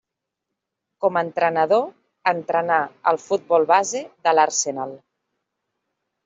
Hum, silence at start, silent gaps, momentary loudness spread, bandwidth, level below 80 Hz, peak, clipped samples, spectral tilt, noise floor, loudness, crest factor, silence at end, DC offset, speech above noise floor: none; 1 s; none; 9 LU; 8 kHz; -74 dBFS; -2 dBFS; under 0.1%; -3 dB/octave; -82 dBFS; -20 LUFS; 20 dB; 1.3 s; under 0.1%; 62 dB